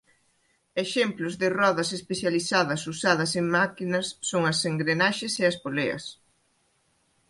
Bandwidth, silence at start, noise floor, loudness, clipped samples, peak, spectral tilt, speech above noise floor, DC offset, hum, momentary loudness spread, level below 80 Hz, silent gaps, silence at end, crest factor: 11.5 kHz; 0.75 s; -69 dBFS; -26 LUFS; under 0.1%; -8 dBFS; -4 dB/octave; 43 dB; under 0.1%; none; 6 LU; -66 dBFS; none; 1.15 s; 20 dB